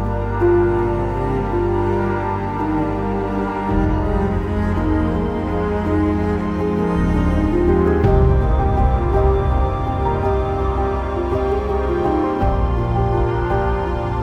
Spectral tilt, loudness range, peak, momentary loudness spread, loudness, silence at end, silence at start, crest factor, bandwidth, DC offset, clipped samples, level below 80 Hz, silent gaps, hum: -9.5 dB/octave; 3 LU; -2 dBFS; 5 LU; -19 LUFS; 0 s; 0 s; 14 dB; 7.8 kHz; under 0.1%; under 0.1%; -24 dBFS; none; none